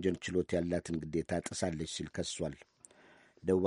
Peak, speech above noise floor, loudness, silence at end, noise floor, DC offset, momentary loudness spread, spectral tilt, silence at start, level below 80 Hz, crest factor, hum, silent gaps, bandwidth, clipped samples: -16 dBFS; 27 dB; -36 LUFS; 0 s; -62 dBFS; under 0.1%; 7 LU; -5 dB/octave; 0 s; -58 dBFS; 20 dB; none; none; 11.5 kHz; under 0.1%